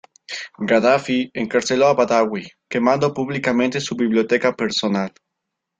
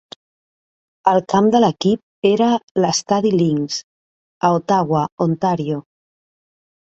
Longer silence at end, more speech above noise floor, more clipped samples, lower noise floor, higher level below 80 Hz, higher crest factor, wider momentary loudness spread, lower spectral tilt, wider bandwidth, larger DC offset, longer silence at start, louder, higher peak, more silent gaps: second, 0.7 s vs 1.1 s; second, 61 dB vs over 74 dB; neither; second, -80 dBFS vs under -90 dBFS; about the same, -60 dBFS vs -58 dBFS; about the same, 18 dB vs 16 dB; first, 11 LU vs 7 LU; about the same, -5 dB/octave vs -5.5 dB/octave; about the same, 9.2 kHz vs 8.4 kHz; neither; second, 0.3 s vs 1.05 s; about the same, -19 LUFS vs -18 LUFS; about the same, -2 dBFS vs -2 dBFS; second, none vs 2.03-2.22 s, 2.63-2.75 s, 3.84-4.41 s, 5.12-5.18 s